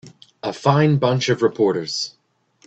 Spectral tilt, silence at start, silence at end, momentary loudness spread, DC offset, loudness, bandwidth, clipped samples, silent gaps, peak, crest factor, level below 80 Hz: -6 dB/octave; 0.05 s; 0.6 s; 13 LU; under 0.1%; -19 LUFS; 8.4 kHz; under 0.1%; none; -2 dBFS; 18 dB; -58 dBFS